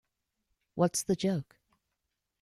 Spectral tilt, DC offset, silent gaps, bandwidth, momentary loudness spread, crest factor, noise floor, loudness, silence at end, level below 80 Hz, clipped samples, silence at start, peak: -5 dB/octave; under 0.1%; none; 15.5 kHz; 9 LU; 22 dB; -85 dBFS; -31 LUFS; 1 s; -68 dBFS; under 0.1%; 0.75 s; -12 dBFS